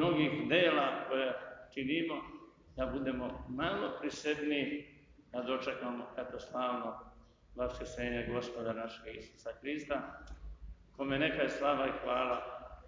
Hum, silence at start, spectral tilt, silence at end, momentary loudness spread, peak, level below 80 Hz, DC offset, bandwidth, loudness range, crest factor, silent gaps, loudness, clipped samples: none; 0 s; -5.5 dB/octave; 0 s; 16 LU; -16 dBFS; -56 dBFS; under 0.1%; 7.6 kHz; 6 LU; 22 dB; none; -36 LUFS; under 0.1%